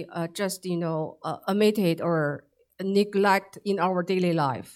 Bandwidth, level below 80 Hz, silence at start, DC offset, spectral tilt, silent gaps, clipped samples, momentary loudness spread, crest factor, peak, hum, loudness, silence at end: 16.5 kHz; -74 dBFS; 0 s; under 0.1%; -6 dB/octave; none; under 0.1%; 10 LU; 18 dB; -8 dBFS; none; -26 LUFS; 0.05 s